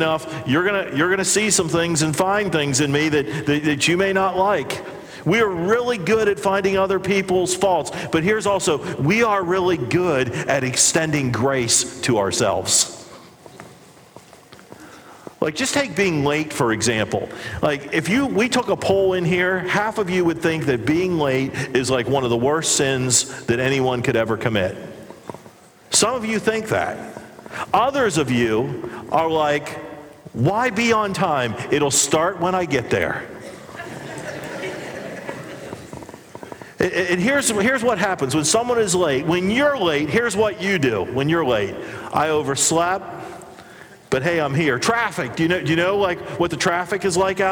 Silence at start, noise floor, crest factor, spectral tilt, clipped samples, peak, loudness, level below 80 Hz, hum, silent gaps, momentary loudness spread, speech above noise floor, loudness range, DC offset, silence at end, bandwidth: 0 s; -46 dBFS; 18 dB; -3.5 dB/octave; under 0.1%; -4 dBFS; -19 LUFS; -52 dBFS; none; none; 14 LU; 27 dB; 5 LU; under 0.1%; 0 s; over 20 kHz